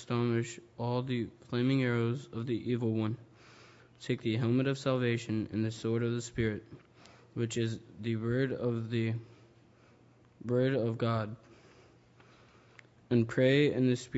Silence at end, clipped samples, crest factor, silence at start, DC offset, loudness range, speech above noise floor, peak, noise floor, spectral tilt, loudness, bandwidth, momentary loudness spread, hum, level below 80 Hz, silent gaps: 0 s; under 0.1%; 20 dB; 0 s; under 0.1%; 3 LU; 30 dB; -14 dBFS; -62 dBFS; -7 dB/octave; -32 LUFS; 8 kHz; 10 LU; none; -64 dBFS; none